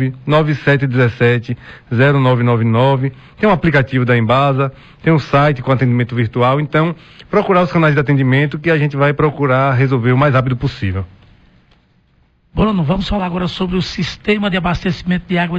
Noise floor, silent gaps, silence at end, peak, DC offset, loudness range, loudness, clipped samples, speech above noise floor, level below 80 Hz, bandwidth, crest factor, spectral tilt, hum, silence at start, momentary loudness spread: -55 dBFS; none; 0 s; -2 dBFS; under 0.1%; 5 LU; -14 LUFS; under 0.1%; 41 dB; -36 dBFS; 7.6 kHz; 12 dB; -8 dB/octave; none; 0 s; 7 LU